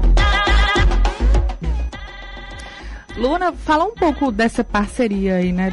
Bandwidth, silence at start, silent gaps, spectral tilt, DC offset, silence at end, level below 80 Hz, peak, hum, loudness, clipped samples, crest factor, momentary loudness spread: 11 kHz; 0 s; none; -6 dB/octave; under 0.1%; 0 s; -20 dBFS; -6 dBFS; none; -18 LUFS; under 0.1%; 10 dB; 18 LU